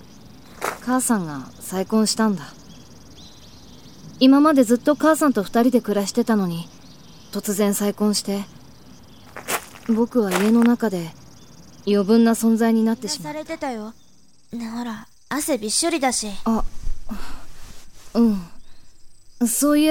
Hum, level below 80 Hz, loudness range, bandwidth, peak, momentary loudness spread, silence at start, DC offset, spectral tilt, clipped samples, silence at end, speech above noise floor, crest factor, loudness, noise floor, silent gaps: none; -40 dBFS; 7 LU; 19 kHz; -2 dBFS; 18 LU; 0.25 s; 0.4%; -4.5 dB/octave; under 0.1%; 0 s; 38 dB; 20 dB; -20 LUFS; -57 dBFS; none